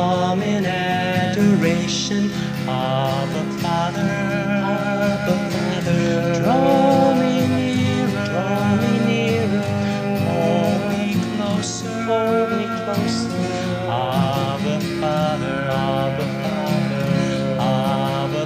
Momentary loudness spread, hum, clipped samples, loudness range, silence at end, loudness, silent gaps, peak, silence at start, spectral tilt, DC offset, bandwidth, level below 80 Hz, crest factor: 6 LU; none; under 0.1%; 3 LU; 0 s; -20 LUFS; none; -4 dBFS; 0 s; -6 dB/octave; under 0.1%; 16 kHz; -50 dBFS; 14 dB